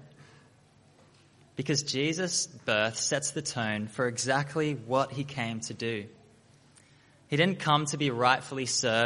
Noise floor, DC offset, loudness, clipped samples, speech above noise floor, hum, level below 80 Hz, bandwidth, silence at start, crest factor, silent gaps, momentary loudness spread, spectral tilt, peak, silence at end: -60 dBFS; under 0.1%; -29 LUFS; under 0.1%; 31 dB; none; -70 dBFS; 11.5 kHz; 0 s; 24 dB; none; 8 LU; -3.5 dB/octave; -8 dBFS; 0 s